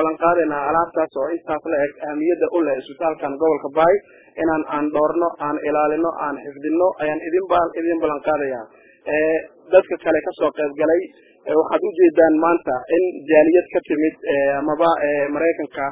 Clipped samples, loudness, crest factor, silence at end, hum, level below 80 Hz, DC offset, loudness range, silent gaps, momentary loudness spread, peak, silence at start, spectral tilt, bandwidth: under 0.1%; -19 LUFS; 18 dB; 0 s; none; -56 dBFS; under 0.1%; 4 LU; none; 8 LU; 0 dBFS; 0 s; -10 dB/octave; 3.9 kHz